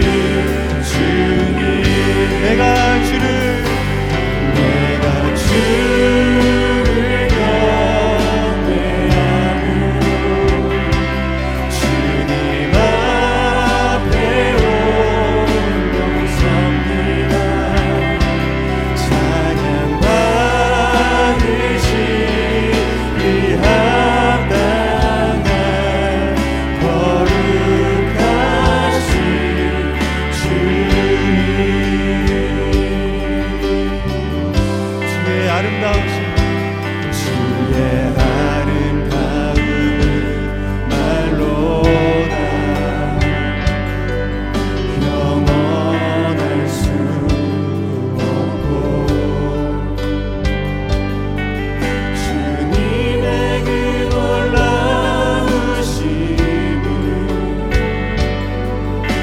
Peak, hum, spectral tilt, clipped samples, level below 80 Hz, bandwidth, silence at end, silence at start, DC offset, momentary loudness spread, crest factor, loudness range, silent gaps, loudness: 0 dBFS; none; -6 dB/octave; under 0.1%; -22 dBFS; 15.5 kHz; 0 s; 0 s; under 0.1%; 6 LU; 14 dB; 4 LU; none; -15 LUFS